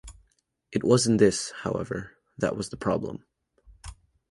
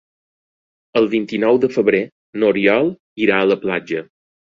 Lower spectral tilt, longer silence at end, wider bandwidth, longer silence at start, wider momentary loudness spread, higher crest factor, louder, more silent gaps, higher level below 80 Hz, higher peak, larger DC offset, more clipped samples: second, -5 dB/octave vs -7 dB/octave; second, 0.35 s vs 0.5 s; first, 11.5 kHz vs 7.4 kHz; second, 0.05 s vs 0.95 s; first, 25 LU vs 8 LU; first, 22 dB vs 16 dB; second, -26 LUFS vs -17 LUFS; second, none vs 2.12-2.33 s, 3.00-3.16 s; first, -52 dBFS vs -58 dBFS; second, -6 dBFS vs -2 dBFS; neither; neither